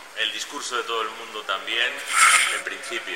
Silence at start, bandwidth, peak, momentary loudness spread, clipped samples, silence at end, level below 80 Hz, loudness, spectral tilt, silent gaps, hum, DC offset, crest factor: 0 s; 17.5 kHz; -2 dBFS; 14 LU; under 0.1%; 0 s; -72 dBFS; -21 LUFS; 2 dB/octave; none; none; 0.2%; 22 dB